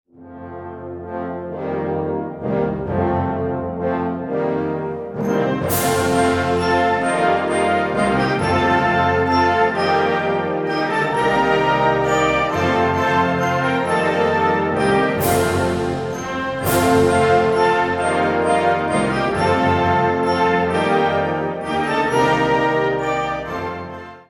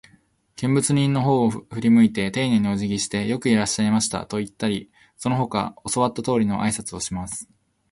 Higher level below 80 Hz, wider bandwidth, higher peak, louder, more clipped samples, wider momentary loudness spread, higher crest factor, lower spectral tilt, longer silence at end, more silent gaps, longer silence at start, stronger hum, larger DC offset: first, -44 dBFS vs -52 dBFS; first, 19.5 kHz vs 11.5 kHz; first, -2 dBFS vs -6 dBFS; first, -18 LUFS vs -22 LUFS; neither; about the same, 8 LU vs 10 LU; about the same, 16 dB vs 16 dB; about the same, -5.5 dB/octave vs -5 dB/octave; second, 0.1 s vs 0.5 s; neither; second, 0.2 s vs 0.6 s; neither; neither